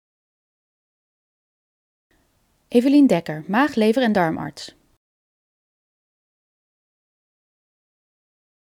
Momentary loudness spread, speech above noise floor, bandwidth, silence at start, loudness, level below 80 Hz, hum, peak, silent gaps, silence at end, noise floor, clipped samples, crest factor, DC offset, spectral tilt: 17 LU; 47 dB; 15 kHz; 2.7 s; -19 LUFS; -64 dBFS; none; -4 dBFS; none; 3.95 s; -65 dBFS; under 0.1%; 20 dB; under 0.1%; -6.5 dB/octave